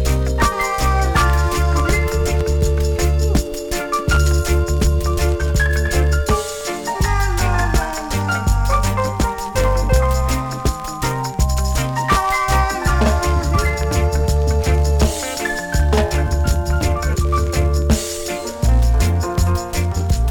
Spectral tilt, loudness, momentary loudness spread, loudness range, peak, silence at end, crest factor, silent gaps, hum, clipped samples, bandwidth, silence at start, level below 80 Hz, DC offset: -5 dB/octave; -18 LUFS; 5 LU; 2 LU; -2 dBFS; 0 s; 14 dB; none; none; under 0.1%; 19 kHz; 0 s; -18 dBFS; under 0.1%